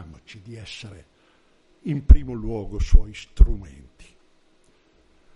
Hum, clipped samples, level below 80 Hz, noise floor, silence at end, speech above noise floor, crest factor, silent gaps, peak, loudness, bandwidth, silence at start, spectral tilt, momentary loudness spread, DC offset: none; under 0.1%; -22 dBFS; -59 dBFS; 1.75 s; 40 dB; 20 dB; none; 0 dBFS; -23 LUFS; 8 kHz; 0.5 s; -7.5 dB/octave; 24 LU; under 0.1%